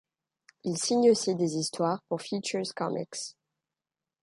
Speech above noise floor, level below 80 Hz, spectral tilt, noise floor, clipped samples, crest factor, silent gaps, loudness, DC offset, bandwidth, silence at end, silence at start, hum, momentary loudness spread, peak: over 62 dB; -76 dBFS; -4.5 dB/octave; under -90 dBFS; under 0.1%; 20 dB; none; -29 LUFS; under 0.1%; 11.5 kHz; 0.9 s; 0.65 s; none; 14 LU; -12 dBFS